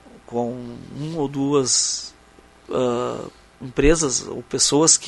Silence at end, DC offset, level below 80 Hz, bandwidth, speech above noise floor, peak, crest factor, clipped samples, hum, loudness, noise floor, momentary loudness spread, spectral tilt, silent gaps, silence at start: 0 s; under 0.1%; -36 dBFS; 11.5 kHz; 29 dB; -2 dBFS; 20 dB; under 0.1%; none; -21 LUFS; -50 dBFS; 17 LU; -3 dB/octave; none; 0.15 s